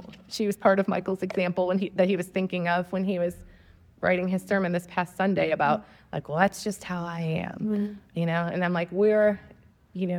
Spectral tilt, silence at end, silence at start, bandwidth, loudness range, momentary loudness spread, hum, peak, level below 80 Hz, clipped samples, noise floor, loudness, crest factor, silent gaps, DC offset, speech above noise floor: -6.5 dB/octave; 0 s; 0 s; 15.5 kHz; 2 LU; 10 LU; none; -4 dBFS; -60 dBFS; under 0.1%; -55 dBFS; -27 LUFS; 22 dB; none; under 0.1%; 29 dB